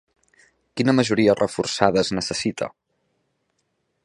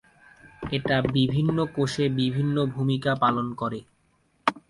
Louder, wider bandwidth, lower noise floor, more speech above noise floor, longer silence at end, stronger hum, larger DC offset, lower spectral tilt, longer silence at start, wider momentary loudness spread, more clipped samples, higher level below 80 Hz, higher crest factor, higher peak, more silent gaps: first, -21 LUFS vs -25 LUFS; about the same, 11.5 kHz vs 11.5 kHz; first, -72 dBFS vs -66 dBFS; first, 52 dB vs 42 dB; first, 1.35 s vs 0.1 s; neither; neither; second, -5 dB/octave vs -7 dB/octave; first, 0.75 s vs 0.45 s; first, 12 LU vs 8 LU; neither; about the same, -56 dBFS vs -54 dBFS; about the same, 22 dB vs 20 dB; first, 0 dBFS vs -6 dBFS; neither